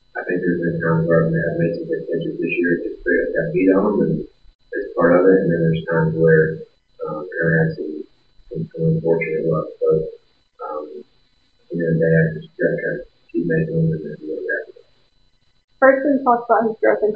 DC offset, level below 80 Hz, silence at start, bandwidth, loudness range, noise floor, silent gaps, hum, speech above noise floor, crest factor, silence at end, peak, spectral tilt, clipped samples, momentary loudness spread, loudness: 0.1%; -50 dBFS; 0.15 s; 5 kHz; 5 LU; -61 dBFS; 4.55-4.59 s, 15.64-15.68 s; none; 43 dB; 18 dB; 0 s; -2 dBFS; -11.5 dB/octave; under 0.1%; 15 LU; -19 LUFS